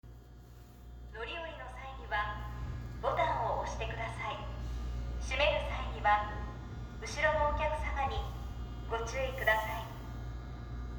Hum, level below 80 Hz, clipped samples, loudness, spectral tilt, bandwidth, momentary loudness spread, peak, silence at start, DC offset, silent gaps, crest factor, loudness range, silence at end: none; -42 dBFS; under 0.1%; -36 LUFS; -4.5 dB/octave; over 20 kHz; 15 LU; -16 dBFS; 0.05 s; under 0.1%; none; 20 dB; 4 LU; 0 s